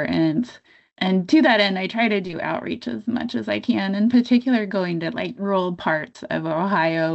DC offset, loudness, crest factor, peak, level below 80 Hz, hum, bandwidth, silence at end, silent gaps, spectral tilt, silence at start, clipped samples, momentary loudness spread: under 0.1%; -21 LUFS; 16 dB; -6 dBFS; -64 dBFS; none; 8.2 kHz; 0 s; none; -7 dB/octave; 0 s; under 0.1%; 10 LU